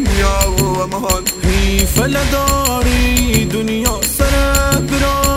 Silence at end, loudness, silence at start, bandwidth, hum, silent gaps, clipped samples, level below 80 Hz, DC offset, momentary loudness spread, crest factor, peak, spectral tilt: 0 s; -14 LUFS; 0 s; 16.5 kHz; none; none; under 0.1%; -18 dBFS; under 0.1%; 3 LU; 14 dB; 0 dBFS; -4 dB/octave